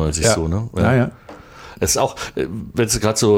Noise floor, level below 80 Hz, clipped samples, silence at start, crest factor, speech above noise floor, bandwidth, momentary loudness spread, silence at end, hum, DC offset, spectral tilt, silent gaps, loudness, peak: -39 dBFS; -36 dBFS; under 0.1%; 0 s; 16 dB; 21 dB; 16.5 kHz; 9 LU; 0 s; none; under 0.1%; -4.5 dB/octave; none; -19 LUFS; -4 dBFS